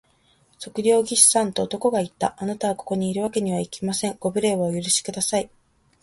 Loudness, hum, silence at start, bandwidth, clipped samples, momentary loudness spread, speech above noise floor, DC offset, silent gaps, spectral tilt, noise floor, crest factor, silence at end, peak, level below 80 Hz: -22 LUFS; none; 0.6 s; 12 kHz; under 0.1%; 12 LU; 38 dB; under 0.1%; none; -3.5 dB/octave; -61 dBFS; 22 dB; 0.55 s; -2 dBFS; -60 dBFS